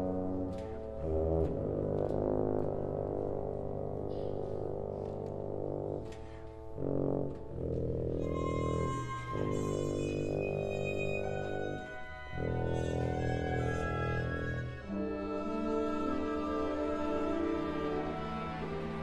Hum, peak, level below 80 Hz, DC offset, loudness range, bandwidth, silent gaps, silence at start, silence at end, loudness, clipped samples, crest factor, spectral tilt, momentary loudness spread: none; -18 dBFS; -48 dBFS; under 0.1%; 4 LU; 11 kHz; none; 0 s; 0 s; -36 LUFS; under 0.1%; 16 dB; -7.5 dB/octave; 6 LU